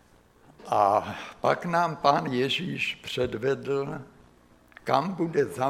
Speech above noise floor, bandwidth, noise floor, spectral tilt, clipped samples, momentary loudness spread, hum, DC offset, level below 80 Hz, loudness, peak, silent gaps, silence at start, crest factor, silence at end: 31 dB; 15.5 kHz; -57 dBFS; -5.5 dB/octave; under 0.1%; 7 LU; none; under 0.1%; -60 dBFS; -27 LUFS; -6 dBFS; none; 0.6 s; 22 dB; 0 s